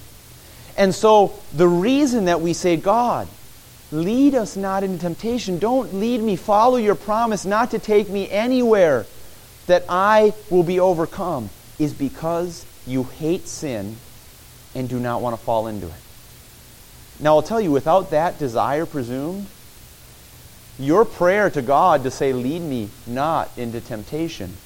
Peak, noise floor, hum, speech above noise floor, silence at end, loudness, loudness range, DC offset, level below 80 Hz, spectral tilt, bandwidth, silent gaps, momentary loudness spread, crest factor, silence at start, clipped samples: -2 dBFS; -44 dBFS; none; 25 dB; 0.1 s; -20 LUFS; 8 LU; under 0.1%; -48 dBFS; -6 dB/octave; 17 kHz; none; 13 LU; 18 dB; 0 s; under 0.1%